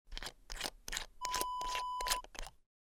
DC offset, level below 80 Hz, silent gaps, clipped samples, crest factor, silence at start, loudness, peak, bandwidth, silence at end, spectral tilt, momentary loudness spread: under 0.1%; -52 dBFS; none; under 0.1%; 26 dB; 0.05 s; -40 LUFS; -16 dBFS; 19 kHz; 0.3 s; 0 dB/octave; 12 LU